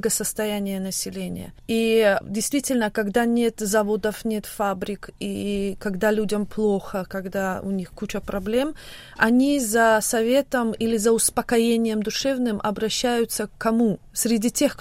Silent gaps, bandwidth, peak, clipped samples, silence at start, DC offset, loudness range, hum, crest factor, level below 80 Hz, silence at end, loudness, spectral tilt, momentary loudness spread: none; 16 kHz; -4 dBFS; under 0.1%; 0.05 s; under 0.1%; 5 LU; none; 18 dB; -48 dBFS; 0.05 s; -23 LUFS; -4 dB/octave; 11 LU